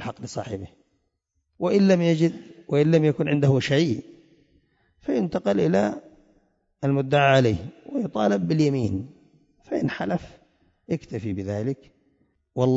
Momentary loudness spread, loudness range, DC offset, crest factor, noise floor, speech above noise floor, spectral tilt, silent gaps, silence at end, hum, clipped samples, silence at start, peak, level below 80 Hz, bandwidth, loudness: 14 LU; 7 LU; under 0.1%; 16 dB; -75 dBFS; 52 dB; -7 dB/octave; none; 0 s; none; under 0.1%; 0 s; -8 dBFS; -56 dBFS; 7.8 kHz; -23 LUFS